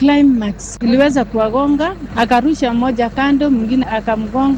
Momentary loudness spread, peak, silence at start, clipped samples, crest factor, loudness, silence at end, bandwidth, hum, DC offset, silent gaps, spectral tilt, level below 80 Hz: 6 LU; 0 dBFS; 0 s; under 0.1%; 14 dB; -15 LUFS; 0 s; 9.4 kHz; none; under 0.1%; none; -5.5 dB/octave; -36 dBFS